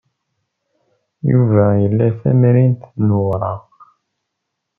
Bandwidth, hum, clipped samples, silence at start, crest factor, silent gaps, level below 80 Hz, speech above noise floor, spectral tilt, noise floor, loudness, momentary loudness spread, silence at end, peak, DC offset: 2.8 kHz; none; under 0.1%; 1.25 s; 14 dB; none; -54 dBFS; 63 dB; -13.5 dB/octave; -76 dBFS; -15 LUFS; 10 LU; 1.2 s; -2 dBFS; under 0.1%